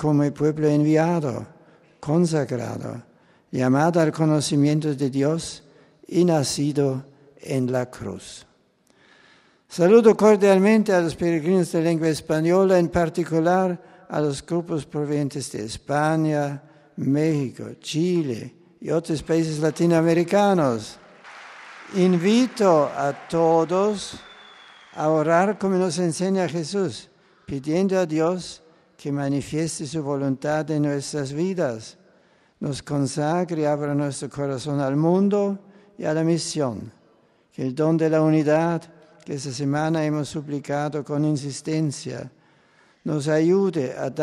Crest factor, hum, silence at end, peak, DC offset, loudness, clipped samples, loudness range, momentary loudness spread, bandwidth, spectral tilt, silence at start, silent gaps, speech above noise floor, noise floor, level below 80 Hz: 18 dB; none; 0 s; -4 dBFS; under 0.1%; -22 LUFS; under 0.1%; 6 LU; 15 LU; 13 kHz; -6.5 dB/octave; 0 s; none; 40 dB; -61 dBFS; -58 dBFS